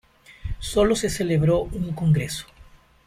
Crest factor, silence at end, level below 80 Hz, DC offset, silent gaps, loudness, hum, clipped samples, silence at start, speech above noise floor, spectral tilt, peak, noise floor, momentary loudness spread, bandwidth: 16 dB; 0.45 s; -38 dBFS; under 0.1%; none; -23 LUFS; none; under 0.1%; 0.3 s; 29 dB; -6 dB/octave; -8 dBFS; -50 dBFS; 13 LU; 15.5 kHz